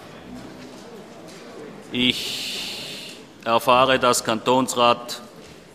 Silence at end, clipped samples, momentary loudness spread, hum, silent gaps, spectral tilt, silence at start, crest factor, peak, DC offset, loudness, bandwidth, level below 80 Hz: 0.15 s; under 0.1%; 23 LU; none; none; -3 dB/octave; 0 s; 22 dB; 0 dBFS; under 0.1%; -20 LUFS; 15 kHz; -56 dBFS